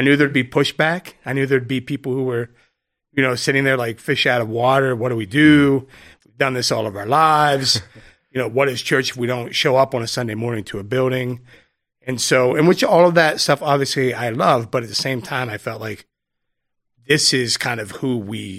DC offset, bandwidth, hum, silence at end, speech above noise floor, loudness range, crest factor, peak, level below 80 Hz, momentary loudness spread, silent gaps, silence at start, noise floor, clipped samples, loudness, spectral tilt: under 0.1%; 16 kHz; none; 0 s; 57 dB; 5 LU; 18 dB; 0 dBFS; -58 dBFS; 12 LU; none; 0 s; -75 dBFS; under 0.1%; -18 LUFS; -4.5 dB/octave